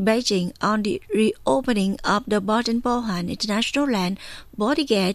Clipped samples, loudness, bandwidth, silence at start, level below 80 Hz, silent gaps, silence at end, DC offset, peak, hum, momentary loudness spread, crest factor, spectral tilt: under 0.1%; -22 LUFS; 14.5 kHz; 0 s; -48 dBFS; none; 0 s; under 0.1%; -6 dBFS; none; 5 LU; 16 dB; -5 dB/octave